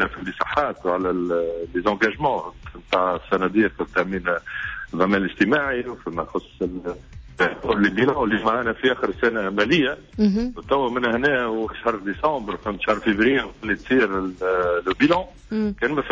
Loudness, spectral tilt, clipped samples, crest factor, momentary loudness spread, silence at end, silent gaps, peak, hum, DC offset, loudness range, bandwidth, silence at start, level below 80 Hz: -22 LUFS; -6.5 dB/octave; under 0.1%; 16 dB; 9 LU; 0 s; none; -6 dBFS; none; under 0.1%; 2 LU; 7.6 kHz; 0 s; -44 dBFS